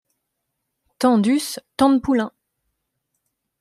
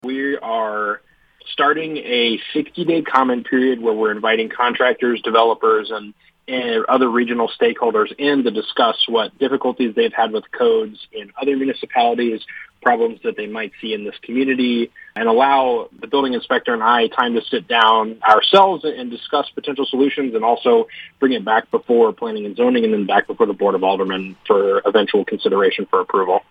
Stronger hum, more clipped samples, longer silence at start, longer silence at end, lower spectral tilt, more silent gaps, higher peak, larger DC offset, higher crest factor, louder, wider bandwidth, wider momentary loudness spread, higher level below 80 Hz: neither; neither; first, 1 s vs 0.05 s; first, 1.35 s vs 0.1 s; about the same, -5 dB/octave vs -6 dB/octave; neither; second, -4 dBFS vs 0 dBFS; neither; about the same, 18 dB vs 18 dB; about the same, -19 LUFS vs -17 LUFS; first, 15 kHz vs 5.8 kHz; about the same, 9 LU vs 10 LU; first, -56 dBFS vs -66 dBFS